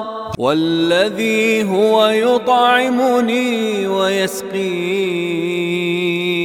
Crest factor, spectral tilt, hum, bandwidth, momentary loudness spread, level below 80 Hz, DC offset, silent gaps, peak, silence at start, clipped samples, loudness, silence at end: 16 dB; -4.5 dB/octave; none; 17.5 kHz; 7 LU; -56 dBFS; under 0.1%; none; 0 dBFS; 0 s; under 0.1%; -16 LUFS; 0 s